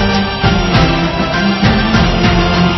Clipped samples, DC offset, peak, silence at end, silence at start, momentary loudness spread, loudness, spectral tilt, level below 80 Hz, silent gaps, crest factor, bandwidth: under 0.1%; under 0.1%; 0 dBFS; 0 s; 0 s; 3 LU; -12 LUFS; -6 dB/octave; -20 dBFS; none; 12 dB; 6.2 kHz